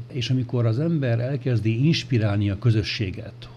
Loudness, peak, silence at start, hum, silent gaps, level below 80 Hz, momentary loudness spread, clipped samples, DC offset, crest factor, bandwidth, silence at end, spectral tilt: -23 LUFS; -10 dBFS; 0 s; none; none; -50 dBFS; 5 LU; under 0.1%; under 0.1%; 12 dB; 7.2 kHz; 0 s; -7 dB/octave